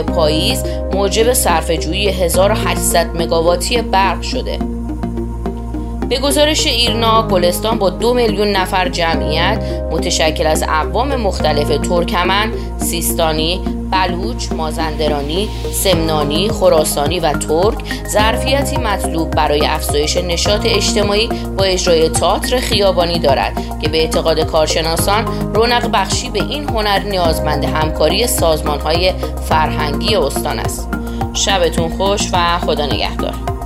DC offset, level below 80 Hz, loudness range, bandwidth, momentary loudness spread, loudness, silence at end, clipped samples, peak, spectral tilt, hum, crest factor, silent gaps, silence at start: under 0.1%; -24 dBFS; 3 LU; 16 kHz; 7 LU; -15 LUFS; 0 s; under 0.1%; 0 dBFS; -4 dB/octave; none; 14 dB; none; 0 s